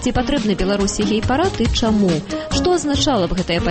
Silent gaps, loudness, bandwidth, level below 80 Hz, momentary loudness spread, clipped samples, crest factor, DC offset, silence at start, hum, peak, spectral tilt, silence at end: none; -18 LUFS; 8.8 kHz; -30 dBFS; 3 LU; under 0.1%; 12 dB; under 0.1%; 0 s; none; -6 dBFS; -5 dB/octave; 0 s